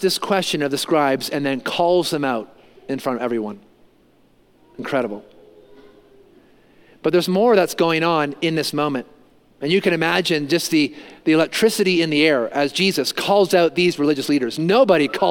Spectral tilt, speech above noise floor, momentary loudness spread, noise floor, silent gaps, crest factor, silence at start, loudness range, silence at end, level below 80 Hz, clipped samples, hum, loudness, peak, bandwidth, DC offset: -4.5 dB/octave; 37 dB; 9 LU; -56 dBFS; none; 18 dB; 0 s; 10 LU; 0 s; -64 dBFS; under 0.1%; none; -19 LUFS; -2 dBFS; 17 kHz; under 0.1%